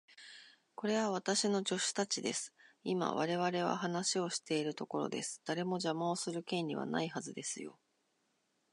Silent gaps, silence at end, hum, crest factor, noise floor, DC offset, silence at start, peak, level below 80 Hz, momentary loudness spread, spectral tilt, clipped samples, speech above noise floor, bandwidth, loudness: none; 1 s; none; 18 dB; -79 dBFS; under 0.1%; 0.1 s; -18 dBFS; -88 dBFS; 12 LU; -3.5 dB/octave; under 0.1%; 43 dB; 11 kHz; -36 LUFS